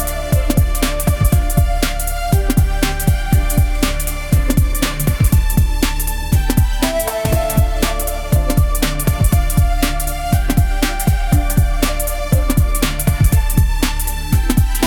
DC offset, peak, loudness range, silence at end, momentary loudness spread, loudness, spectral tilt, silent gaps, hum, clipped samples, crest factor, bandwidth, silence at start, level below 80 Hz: under 0.1%; 0 dBFS; 1 LU; 0 s; 4 LU; -17 LUFS; -5 dB/octave; none; none; under 0.1%; 14 dB; over 20 kHz; 0 s; -16 dBFS